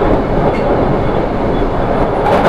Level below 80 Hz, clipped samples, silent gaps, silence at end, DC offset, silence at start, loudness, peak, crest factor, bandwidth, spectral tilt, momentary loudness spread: -22 dBFS; under 0.1%; none; 0 s; under 0.1%; 0 s; -14 LUFS; 0 dBFS; 12 dB; 10.5 kHz; -8 dB/octave; 2 LU